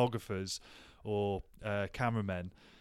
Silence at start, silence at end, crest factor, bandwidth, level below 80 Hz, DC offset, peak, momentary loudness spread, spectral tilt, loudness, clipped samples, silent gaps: 0 s; 0.05 s; 20 dB; 15.5 kHz; -58 dBFS; under 0.1%; -18 dBFS; 12 LU; -5.5 dB/octave; -37 LUFS; under 0.1%; none